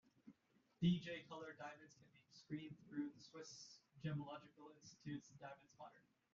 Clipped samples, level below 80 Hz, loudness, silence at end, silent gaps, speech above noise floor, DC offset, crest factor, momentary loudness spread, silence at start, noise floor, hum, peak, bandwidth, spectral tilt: under 0.1%; -80 dBFS; -49 LUFS; 0.35 s; none; 29 dB; under 0.1%; 22 dB; 23 LU; 0.25 s; -79 dBFS; none; -28 dBFS; 7.4 kHz; -6 dB/octave